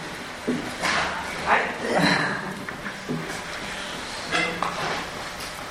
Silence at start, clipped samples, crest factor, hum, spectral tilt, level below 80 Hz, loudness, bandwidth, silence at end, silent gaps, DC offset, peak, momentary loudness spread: 0 s; under 0.1%; 20 dB; none; -3.5 dB/octave; -50 dBFS; -26 LUFS; 16 kHz; 0 s; none; under 0.1%; -6 dBFS; 11 LU